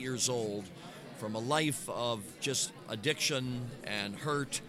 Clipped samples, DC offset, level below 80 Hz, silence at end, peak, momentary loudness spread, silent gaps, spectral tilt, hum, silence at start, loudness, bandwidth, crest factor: under 0.1%; under 0.1%; -66 dBFS; 0 s; -16 dBFS; 11 LU; none; -3 dB/octave; none; 0 s; -34 LUFS; 16 kHz; 20 dB